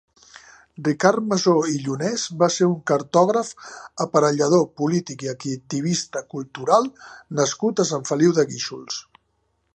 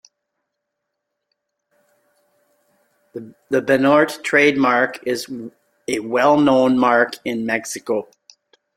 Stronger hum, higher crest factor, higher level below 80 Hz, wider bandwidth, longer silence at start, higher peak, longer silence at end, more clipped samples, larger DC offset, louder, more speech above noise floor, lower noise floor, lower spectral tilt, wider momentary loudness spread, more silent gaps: neither; about the same, 20 dB vs 18 dB; about the same, -68 dBFS vs -64 dBFS; second, 9.6 kHz vs 16 kHz; second, 0.8 s vs 3.15 s; about the same, 0 dBFS vs -2 dBFS; about the same, 0.75 s vs 0.75 s; neither; neither; second, -21 LUFS vs -17 LUFS; second, 48 dB vs 61 dB; second, -70 dBFS vs -78 dBFS; about the same, -5 dB/octave vs -4.5 dB/octave; second, 12 LU vs 20 LU; neither